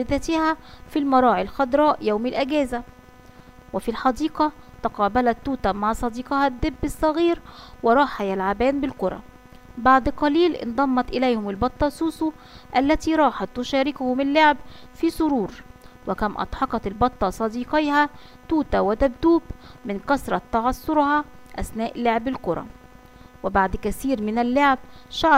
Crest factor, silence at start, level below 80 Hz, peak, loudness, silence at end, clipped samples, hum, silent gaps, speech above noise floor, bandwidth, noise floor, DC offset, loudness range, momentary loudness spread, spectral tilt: 18 dB; 0 s; -40 dBFS; -4 dBFS; -22 LUFS; 0 s; under 0.1%; none; none; 25 dB; 16 kHz; -47 dBFS; under 0.1%; 3 LU; 10 LU; -5.5 dB/octave